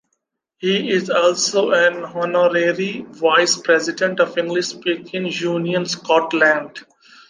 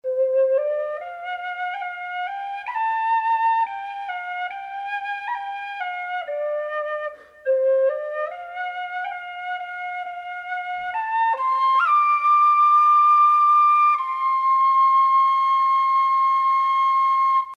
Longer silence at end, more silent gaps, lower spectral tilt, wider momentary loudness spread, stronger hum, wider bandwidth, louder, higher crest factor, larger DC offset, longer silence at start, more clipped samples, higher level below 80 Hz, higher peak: first, 0.45 s vs 0.05 s; neither; first, -3.5 dB/octave vs -0.5 dB/octave; second, 8 LU vs 15 LU; neither; first, 10 kHz vs 6.8 kHz; about the same, -18 LUFS vs -20 LUFS; first, 18 dB vs 10 dB; neither; first, 0.6 s vs 0.05 s; neither; about the same, -72 dBFS vs -72 dBFS; first, -2 dBFS vs -10 dBFS